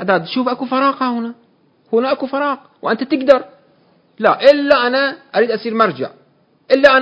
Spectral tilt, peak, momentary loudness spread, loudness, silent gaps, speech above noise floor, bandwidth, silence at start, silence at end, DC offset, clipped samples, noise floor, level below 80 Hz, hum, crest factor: -6 dB/octave; 0 dBFS; 10 LU; -15 LUFS; none; 40 dB; 8 kHz; 0 s; 0 s; under 0.1%; 0.4%; -55 dBFS; -60 dBFS; none; 16 dB